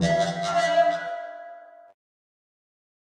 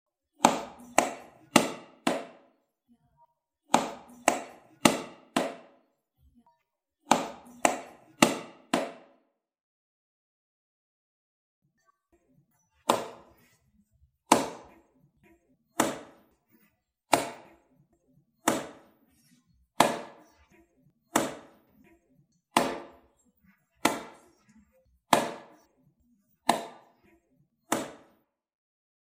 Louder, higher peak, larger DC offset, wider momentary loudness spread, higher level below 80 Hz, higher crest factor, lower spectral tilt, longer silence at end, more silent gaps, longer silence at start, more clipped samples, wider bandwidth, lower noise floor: first, -24 LUFS vs -29 LUFS; second, -10 dBFS vs -2 dBFS; neither; about the same, 20 LU vs 19 LU; first, -56 dBFS vs -68 dBFS; second, 16 dB vs 32 dB; first, -5 dB/octave vs -3 dB/octave; first, 1.5 s vs 1.15 s; second, none vs 9.61-11.62 s; second, 0 s vs 0.4 s; neither; second, 11 kHz vs 16.5 kHz; second, -45 dBFS vs -80 dBFS